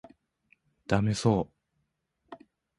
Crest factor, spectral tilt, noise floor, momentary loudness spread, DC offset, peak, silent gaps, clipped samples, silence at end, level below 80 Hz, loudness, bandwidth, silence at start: 24 dB; -6.5 dB/octave; -78 dBFS; 25 LU; under 0.1%; -10 dBFS; none; under 0.1%; 0.45 s; -54 dBFS; -28 LUFS; 11.5 kHz; 0.9 s